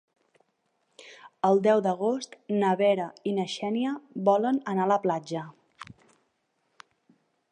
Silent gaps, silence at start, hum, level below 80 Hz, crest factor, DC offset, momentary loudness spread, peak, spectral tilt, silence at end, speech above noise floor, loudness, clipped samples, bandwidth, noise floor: none; 1 s; none; -78 dBFS; 18 dB; under 0.1%; 23 LU; -10 dBFS; -6.5 dB/octave; 1.7 s; 49 dB; -26 LUFS; under 0.1%; 10 kHz; -75 dBFS